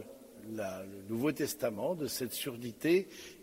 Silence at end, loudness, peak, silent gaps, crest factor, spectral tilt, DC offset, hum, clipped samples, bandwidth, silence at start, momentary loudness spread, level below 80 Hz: 0 s; -35 LUFS; -18 dBFS; none; 18 dB; -4.5 dB/octave; under 0.1%; none; under 0.1%; 16 kHz; 0 s; 14 LU; -72 dBFS